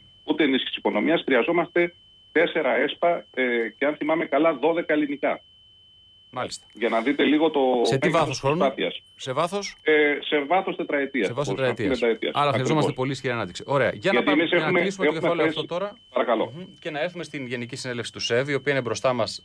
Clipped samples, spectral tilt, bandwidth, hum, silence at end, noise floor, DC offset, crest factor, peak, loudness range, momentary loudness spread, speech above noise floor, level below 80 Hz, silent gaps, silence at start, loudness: under 0.1%; -5 dB/octave; 11 kHz; none; 0.05 s; -54 dBFS; under 0.1%; 14 dB; -10 dBFS; 3 LU; 10 LU; 30 dB; -62 dBFS; none; 0.25 s; -24 LUFS